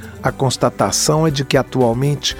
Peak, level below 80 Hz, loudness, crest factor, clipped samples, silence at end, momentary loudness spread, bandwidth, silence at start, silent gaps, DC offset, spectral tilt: 0 dBFS; -40 dBFS; -16 LUFS; 16 dB; under 0.1%; 0 s; 4 LU; 17 kHz; 0 s; none; under 0.1%; -4.5 dB/octave